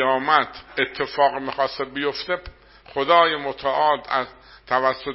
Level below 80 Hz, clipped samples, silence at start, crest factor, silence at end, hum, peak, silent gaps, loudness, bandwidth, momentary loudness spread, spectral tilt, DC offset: -54 dBFS; under 0.1%; 0 s; 22 dB; 0 s; none; 0 dBFS; none; -22 LUFS; 5.8 kHz; 11 LU; -0.5 dB/octave; under 0.1%